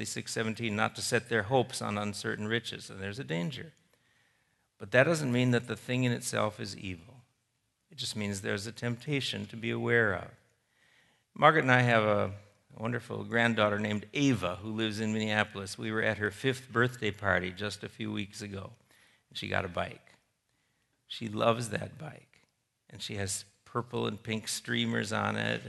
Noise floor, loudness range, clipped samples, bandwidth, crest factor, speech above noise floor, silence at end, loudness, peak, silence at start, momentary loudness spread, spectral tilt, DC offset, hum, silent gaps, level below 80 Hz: -78 dBFS; 8 LU; under 0.1%; 12 kHz; 26 dB; 47 dB; 0 s; -31 LUFS; -6 dBFS; 0 s; 14 LU; -4.5 dB/octave; under 0.1%; none; none; -70 dBFS